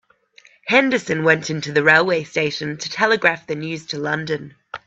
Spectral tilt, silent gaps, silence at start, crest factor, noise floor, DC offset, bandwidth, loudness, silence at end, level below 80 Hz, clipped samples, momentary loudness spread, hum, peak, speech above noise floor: -4.5 dB/octave; none; 0.65 s; 20 dB; -52 dBFS; under 0.1%; 8 kHz; -19 LUFS; 0.1 s; -62 dBFS; under 0.1%; 13 LU; none; 0 dBFS; 33 dB